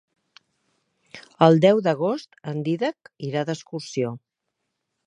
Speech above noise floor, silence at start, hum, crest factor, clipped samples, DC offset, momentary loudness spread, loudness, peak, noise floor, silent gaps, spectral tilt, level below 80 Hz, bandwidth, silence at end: 58 dB; 1.15 s; none; 24 dB; under 0.1%; under 0.1%; 15 LU; -22 LUFS; 0 dBFS; -80 dBFS; none; -7 dB/octave; -70 dBFS; 10 kHz; 0.9 s